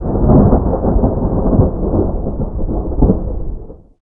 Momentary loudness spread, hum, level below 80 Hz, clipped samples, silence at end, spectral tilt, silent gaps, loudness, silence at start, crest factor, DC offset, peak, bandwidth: 13 LU; none; -18 dBFS; under 0.1%; 0.25 s; -16.5 dB/octave; none; -15 LUFS; 0 s; 14 dB; under 0.1%; 0 dBFS; 1.9 kHz